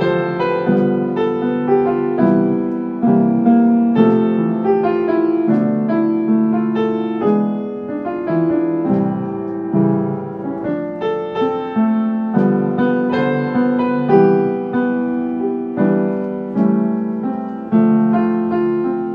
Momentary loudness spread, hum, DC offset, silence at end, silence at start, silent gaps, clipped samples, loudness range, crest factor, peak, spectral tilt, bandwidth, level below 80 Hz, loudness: 8 LU; none; under 0.1%; 0 s; 0 s; none; under 0.1%; 4 LU; 16 dB; 0 dBFS; -10.5 dB/octave; 5.2 kHz; -58 dBFS; -17 LUFS